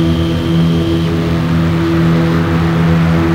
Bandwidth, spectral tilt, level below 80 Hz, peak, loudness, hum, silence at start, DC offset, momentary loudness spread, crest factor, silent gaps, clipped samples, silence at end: 9.8 kHz; -7.5 dB/octave; -28 dBFS; -2 dBFS; -13 LUFS; none; 0 s; under 0.1%; 3 LU; 10 dB; none; under 0.1%; 0 s